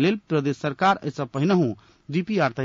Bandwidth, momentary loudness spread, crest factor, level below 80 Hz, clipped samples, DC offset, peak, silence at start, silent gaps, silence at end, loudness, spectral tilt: 7.6 kHz; 8 LU; 14 dB; -64 dBFS; under 0.1%; under 0.1%; -10 dBFS; 0 s; none; 0 s; -24 LUFS; -7 dB/octave